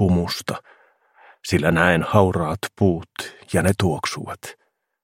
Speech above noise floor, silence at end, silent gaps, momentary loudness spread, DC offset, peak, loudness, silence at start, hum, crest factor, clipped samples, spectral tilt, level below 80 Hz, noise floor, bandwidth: 35 dB; 0.5 s; none; 17 LU; under 0.1%; 0 dBFS; -21 LUFS; 0 s; none; 22 dB; under 0.1%; -5.5 dB/octave; -46 dBFS; -56 dBFS; 16.5 kHz